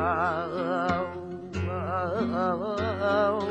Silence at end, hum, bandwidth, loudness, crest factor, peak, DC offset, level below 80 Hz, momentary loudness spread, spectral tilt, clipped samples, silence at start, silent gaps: 0 s; none; 10.5 kHz; -28 LUFS; 14 dB; -14 dBFS; under 0.1%; -52 dBFS; 8 LU; -7.5 dB/octave; under 0.1%; 0 s; none